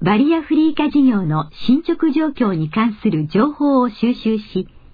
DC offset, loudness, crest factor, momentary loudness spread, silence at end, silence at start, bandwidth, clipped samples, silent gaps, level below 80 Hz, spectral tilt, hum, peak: under 0.1%; -17 LUFS; 12 dB; 6 LU; 0.25 s; 0 s; 5 kHz; under 0.1%; none; -46 dBFS; -9.5 dB/octave; none; -4 dBFS